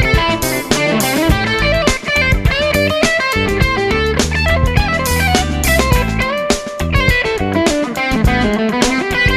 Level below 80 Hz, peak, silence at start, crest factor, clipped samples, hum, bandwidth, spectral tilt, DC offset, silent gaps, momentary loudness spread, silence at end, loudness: -22 dBFS; 0 dBFS; 0 s; 14 dB; under 0.1%; none; 14.5 kHz; -4.5 dB/octave; under 0.1%; none; 3 LU; 0 s; -14 LUFS